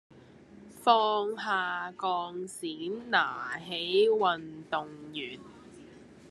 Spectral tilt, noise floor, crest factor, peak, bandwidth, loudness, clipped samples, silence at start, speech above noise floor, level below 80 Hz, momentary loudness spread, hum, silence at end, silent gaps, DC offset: -3.5 dB/octave; -53 dBFS; 22 dB; -8 dBFS; 12.5 kHz; -30 LUFS; under 0.1%; 0.15 s; 24 dB; -74 dBFS; 14 LU; none; 0 s; none; under 0.1%